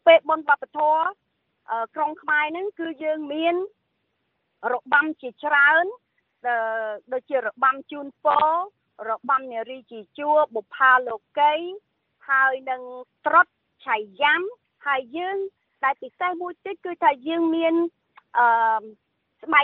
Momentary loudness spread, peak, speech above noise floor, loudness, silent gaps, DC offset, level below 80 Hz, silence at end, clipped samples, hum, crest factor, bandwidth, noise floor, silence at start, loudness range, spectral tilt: 15 LU; -4 dBFS; 52 dB; -23 LUFS; none; under 0.1%; -78 dBFS; 0 s; under 0.1%; none; 20 dB; 4.3 kHz; -74 dBFS; 0.05 s; 4 LU; -6 dB/octave